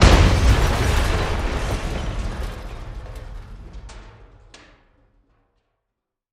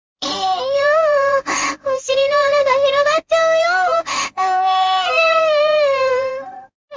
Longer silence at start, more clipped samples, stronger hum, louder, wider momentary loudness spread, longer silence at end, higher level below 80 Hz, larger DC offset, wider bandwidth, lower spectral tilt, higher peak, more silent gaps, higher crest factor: second, 0 s vs 0.2 s; neither; neither; second, -21 LUFS vs -16 LUFS; first, 24 LU vs 7 LU; first, 2.1 s vs 0 s; first, -24 dBFS vs -58 dBFS; neither; first, 15 kHz vs 7.6 kHz; first, -5 dB/octave vs -1 dB/octave; first, 0 dBFS vs -4 dBFS; second, none vs 6.75-6.88 s; first, 20 dB vs 12 dB